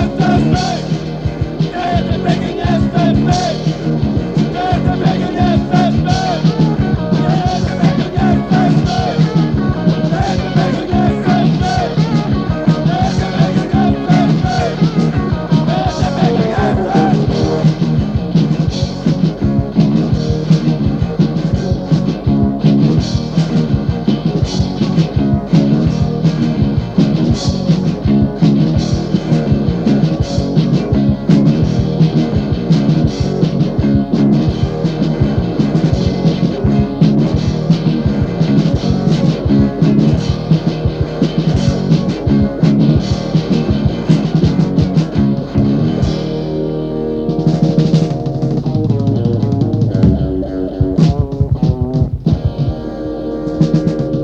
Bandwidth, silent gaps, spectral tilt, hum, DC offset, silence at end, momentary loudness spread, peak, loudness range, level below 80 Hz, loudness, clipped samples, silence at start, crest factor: 7.8 kHz; none; -8 dB/octave; none; under 0.1%; 0 s; 4 LU; 0 dBFS; 2 LU; -28 dBFS; -14 LUFS; under 0.1%; 0 s; 12 dB